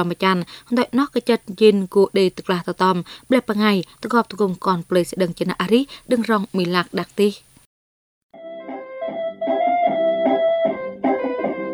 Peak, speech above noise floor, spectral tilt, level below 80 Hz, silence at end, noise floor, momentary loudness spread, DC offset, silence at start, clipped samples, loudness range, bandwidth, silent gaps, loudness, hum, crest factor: -2 dBFS; over 71 dB; -6 dB/octave; -60 dBFS; 0 s; under -90 dBFS; 8 LU; under 0.1%; 0 s; under 0.1%; 5 LU; over 20 kHz; 7.66-8.29 s; -20 LUFS; none; 18 dB